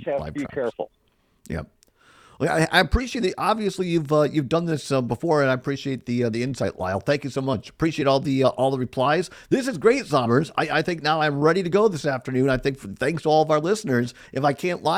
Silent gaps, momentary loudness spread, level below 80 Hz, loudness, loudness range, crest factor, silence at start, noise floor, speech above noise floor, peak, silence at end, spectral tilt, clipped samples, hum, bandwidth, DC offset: none; 8 LU; -42 dBFS; -23 LUFS; 3 LU; 20 dB; 0 s; -55 dBFS; 33 dB; -4 dBFS; 0 s; -6 dB/octave; under 0.1%; none; 15.5 kHz; under 0.1%